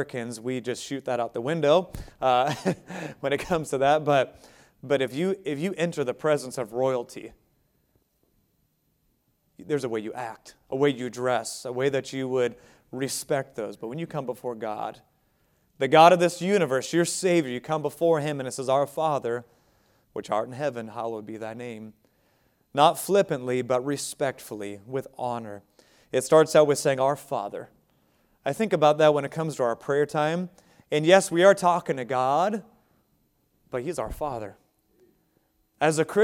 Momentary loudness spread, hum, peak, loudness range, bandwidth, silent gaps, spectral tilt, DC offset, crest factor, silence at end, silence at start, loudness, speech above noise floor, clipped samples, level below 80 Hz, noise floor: 16 LU; none; -2 dBFS; 10 LU; 17 kHz; none; -5 dB/octave; under 0.1%; 24 dB; 0 s; 0 s; -25 LUFS; 46 dB; under 0.1%; -58 dBFS; -70 dBFS